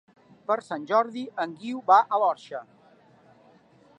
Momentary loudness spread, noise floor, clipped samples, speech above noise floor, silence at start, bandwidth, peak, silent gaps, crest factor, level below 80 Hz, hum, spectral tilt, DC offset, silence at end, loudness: 18 LU; -57 dBFS; under 0.1%; 32 dB; 0.5 s; 9.8 kHz; -6 dBFS; none; 22 dB; -82 dBFS; none; -5 dB/octave; under 0.1%; 1.35 s; -25 LUFS